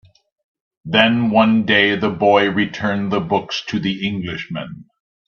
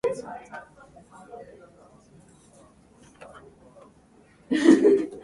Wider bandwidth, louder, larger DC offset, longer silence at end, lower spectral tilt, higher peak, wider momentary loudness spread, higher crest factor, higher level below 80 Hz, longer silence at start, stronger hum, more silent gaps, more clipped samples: second, 7 kHz vs 11.5 kHz; first, -17 LUFS vs -21 LUFS; neither; first, 0.45 s vs 0.05 s; about the same, -6 dB/octave vs -5.5 dB/octave; first, 0 dBFS vs -4 dBFS; second, 12 LU vs 30 LU; second, 18 dB vs 24 dB; first, -56 dBFS vs -64 dBFS; first, 0.85 s vs 0.05 s; neither; neither; neither